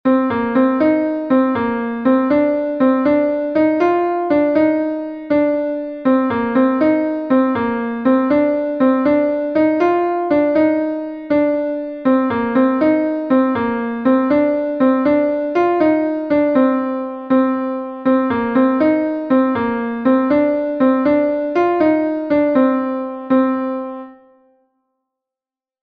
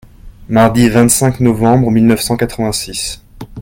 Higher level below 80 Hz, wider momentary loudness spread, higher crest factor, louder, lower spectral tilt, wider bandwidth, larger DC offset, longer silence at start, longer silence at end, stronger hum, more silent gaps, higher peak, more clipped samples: second, -54 dBFS vs -34 dBFS; second, 6 LU vs 11 LU; about the same, 14 dB vs 12 dB; second, -16 LUFS vs -12 LUFS; first, -8.5 dB/octave vs -5 dB/octave; second, 5.2 kHz vs 17 kHz; neither; second, 0.05 s vs 0.25 s; first, 1.7 s vs 0 s; neither; neither; about the same, -2 dBFS vs 0 dBFS; neither